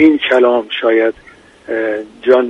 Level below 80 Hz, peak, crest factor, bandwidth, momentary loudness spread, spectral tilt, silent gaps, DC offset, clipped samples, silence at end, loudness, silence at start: -54 dBFS; 0 dBFS; 14 dB; 7.4 kHz; 10 LU; -5.5 dB/octave; none; under 0.1%; under 0.1%; 0 s; -14 LUFS; 0 s